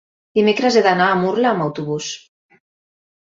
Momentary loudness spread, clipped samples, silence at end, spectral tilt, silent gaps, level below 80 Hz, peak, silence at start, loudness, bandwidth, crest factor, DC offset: 11 LU; under 0.1%; 1.05 s; -5 dB/octave; none; -62 dBFS; -2 dBFS; 0.35 s; -17 LUFS; 7.8 kHz; 16 dB; under 0.1%